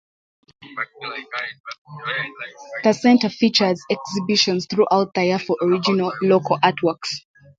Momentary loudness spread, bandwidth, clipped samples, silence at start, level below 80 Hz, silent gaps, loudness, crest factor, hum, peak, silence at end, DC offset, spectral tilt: 15 LU; 7.8 kHz; under 0.1%; 0.6 s; -66 dBFS; 1.60-1.64 s, 1.78-1.85 s; -20 LUFS; 20 dB; none; -2 dBFS; 0.4 s; under 0.1%; -4.5 dB/octave